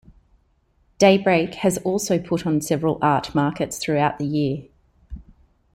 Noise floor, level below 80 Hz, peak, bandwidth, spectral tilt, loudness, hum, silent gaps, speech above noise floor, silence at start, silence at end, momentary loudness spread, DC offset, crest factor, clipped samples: -63 dBFS; -50 dBFS; -2 dBFS; 16 kHz; -5.5 dB/octave; -21 LUFS; none; none; 43 dB; 1 s; 0.55 s; 9 LU; under 0.1%; 20 dB; under 0.1%